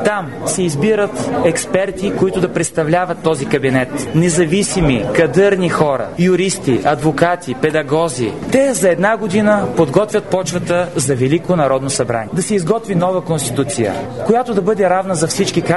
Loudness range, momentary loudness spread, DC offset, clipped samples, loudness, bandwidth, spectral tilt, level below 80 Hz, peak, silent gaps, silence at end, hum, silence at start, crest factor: 2 LU; 4 LU; 0.7%; under 0.1%; -15 LUFS; 12 kHz; -5 dB/octave; -42 dBFS; 0 dBFS; none; 0 s; none; 0 s; 14 dB